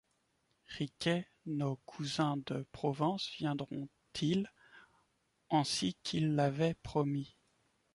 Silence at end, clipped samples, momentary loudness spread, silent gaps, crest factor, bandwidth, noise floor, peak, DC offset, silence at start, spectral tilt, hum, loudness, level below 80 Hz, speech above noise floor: 0.65 s; under 0.1%; 10 LU; none; 18 dB; 11.5 kHz; -78 dBFS; -20 dBFS; under 0.1%; 0.7 s; -5.5 dB/octave; none; -36 LUFS; -68 dBFS; 43 dB